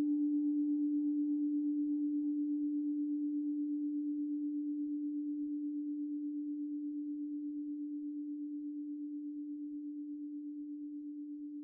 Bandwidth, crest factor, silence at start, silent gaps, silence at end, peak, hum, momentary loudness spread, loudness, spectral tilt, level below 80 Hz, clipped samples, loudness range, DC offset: 0.9 kHz; 10 dB; 0 s; none; 0 s; -28 dBFS; none; 10 LU; -38 LUFS; 8 dB/octave; -86 dBFS; under 0.1%; 8 LU; under 0.1%